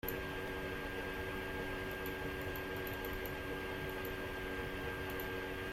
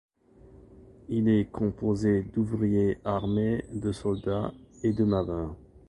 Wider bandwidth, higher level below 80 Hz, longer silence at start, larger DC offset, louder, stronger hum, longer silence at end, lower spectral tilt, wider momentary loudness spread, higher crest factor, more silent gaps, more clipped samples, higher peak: first, 16 kHz vs 10.5 kHz; about the same, -52 dBFS vs -48 dBFS; second, 0.05 s vs 0.55 s; neither; second, -42 LUFS vs -28 LUFS; neither; second, 0 s vs 0.3 s; second, -5 dB/octave vs -8.5 dB/octave; second, 1 LU vs 8 LU; about the same, 18 dB vs 16 dB; neither; neither; second, -24 dBFS vs -14 dBFS